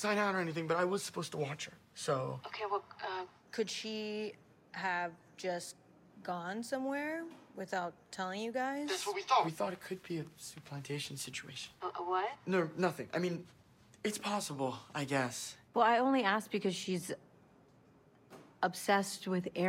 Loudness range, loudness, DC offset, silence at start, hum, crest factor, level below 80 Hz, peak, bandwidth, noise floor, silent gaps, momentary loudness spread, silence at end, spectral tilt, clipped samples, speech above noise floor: 6 LU; -37 LUFS; under 0.1%; 0 s; none; 20 dB; -80 dBFS; -18 dBFS; 16.5 kHz; -64 dBFS; none; 13 LU; 0 s; -4.5 dB/octave; under 0.1%; 28 dB